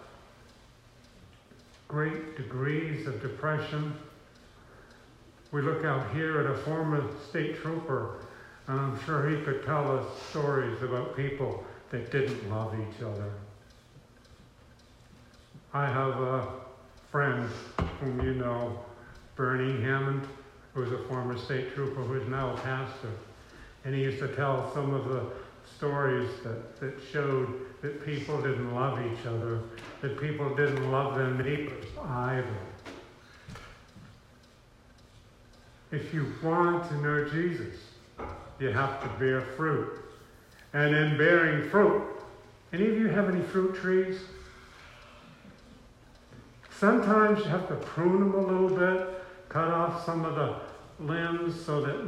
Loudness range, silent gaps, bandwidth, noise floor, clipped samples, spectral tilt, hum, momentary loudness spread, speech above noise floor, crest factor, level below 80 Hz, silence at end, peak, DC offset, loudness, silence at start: 9 LU; none; 11.5 kHz; -57 dBFS; under 0.1%; -7.5 dB/octave; none; 19 LU; 28 dB; 22 dB; -58 dBFS; 0 s; -10 dBFS; under 0.1%; -30 LUFS; 0 s